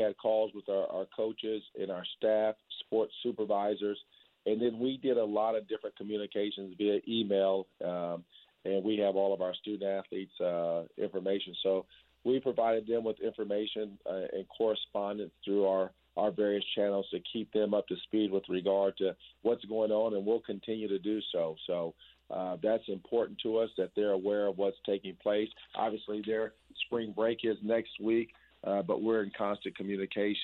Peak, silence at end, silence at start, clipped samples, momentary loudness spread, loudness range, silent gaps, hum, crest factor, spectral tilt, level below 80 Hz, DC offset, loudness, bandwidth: -16 dBFS; 0 s; 0 s; under 0.1%; 8 LU; 2 LU; none; none; 16 dB; -8.5 dB/octave; -74 dBFS; under 0.1%; -33 LUFS; 4.3 kHz